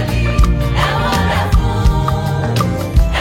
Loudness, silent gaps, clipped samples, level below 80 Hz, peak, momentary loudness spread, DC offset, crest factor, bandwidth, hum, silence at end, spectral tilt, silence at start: -15 LUFS; none; under 0.1%; -16 dBFS; 0 dBFS; 2 LU; under 0.1%; 12 dB; 16.5 kHz; none; 0 s; -6 dB/octave; 0 s